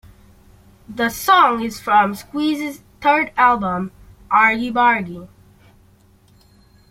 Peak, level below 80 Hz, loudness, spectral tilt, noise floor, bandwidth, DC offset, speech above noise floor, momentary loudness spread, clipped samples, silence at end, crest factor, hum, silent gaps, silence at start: -2 dBFS; -50 dBFS; -17 LUFS; -4 dB/octave; -52 dBFS; 16.5 kHz; under 0.1%; 35 dB; 15 LU; under 0.1%; 1.65 s; 18 dB; none; none; 0.9 s